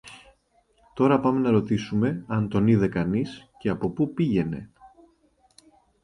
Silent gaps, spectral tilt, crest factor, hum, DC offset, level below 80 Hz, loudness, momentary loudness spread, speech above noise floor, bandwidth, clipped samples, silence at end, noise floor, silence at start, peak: none; -8.5 dB/octave; 18 dB; none; under 0.1%; -52 dBFS; -24 LUFS; 11 LU; 42 dB; 11 kHz; under 0.1%; 1.15 s; -65 dBFS; 0.05 s; -8 dBFS